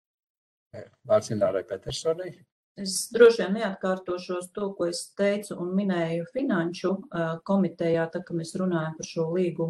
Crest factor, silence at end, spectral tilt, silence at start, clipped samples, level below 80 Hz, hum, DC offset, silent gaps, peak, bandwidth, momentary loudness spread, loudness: 24 dB; 0 s; -5.5 dB/octave; 0.75 s; under 0.1%; -64 dBFS; none; under 0.1%; 2.52-2.75 s; -4 dBFS; 12.5 kHz; 9 LU; -27 LUFS